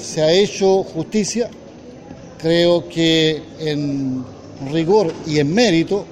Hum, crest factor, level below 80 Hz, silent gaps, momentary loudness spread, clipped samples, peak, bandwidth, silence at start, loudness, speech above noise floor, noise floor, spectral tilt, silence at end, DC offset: none; 16 dB; -48 dBFS; none; 13 LU; under 0.1%; -2 dBFS; 12 kHz; 0 s; -17 LUFS; 21 dB; -38 dBFS; -5 dB/octave; 0 s; under 0.1%